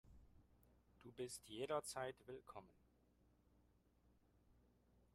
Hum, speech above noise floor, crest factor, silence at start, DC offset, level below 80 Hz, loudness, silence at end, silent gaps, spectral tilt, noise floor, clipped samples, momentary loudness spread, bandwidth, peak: 60 Hz at -75 dBFS; 27 dB; 24 dB; 0.05 s; under 0.1%; -76 dBFS; -50 LUFS; 0.55 s; none; -3.5 dB/octave; -77 dBFS; under 0.1%; 16 LU; 14.5 kHz; -30 dBFS